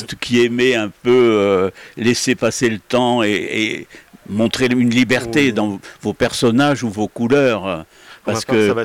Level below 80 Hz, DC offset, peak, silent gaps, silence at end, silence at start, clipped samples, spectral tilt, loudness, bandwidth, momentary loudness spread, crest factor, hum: -52 dBFS; under 0.1%; -6 dBFS; none; 0 s; 0 s; under 0.1%; -5 dB/octave; -16 LUFS; 16 kHz; 9 LU; 10 dB; none